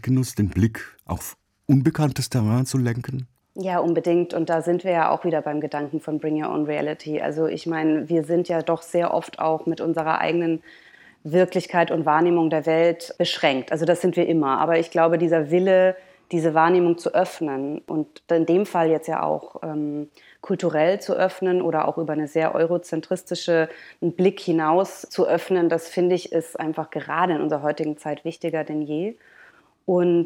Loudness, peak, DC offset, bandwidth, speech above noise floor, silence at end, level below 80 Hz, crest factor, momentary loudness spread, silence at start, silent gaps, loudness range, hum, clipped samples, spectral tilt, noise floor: -22 LUFS; -4 dBFS; under 0.1%; 16.5 kHz; 31 dB; 0 s; -60 dBFS; 18 dB; 9 LU; 0.05 s; none; 4 LU; none; under 0.1%; -6.5 dB/octave; -53 dBFS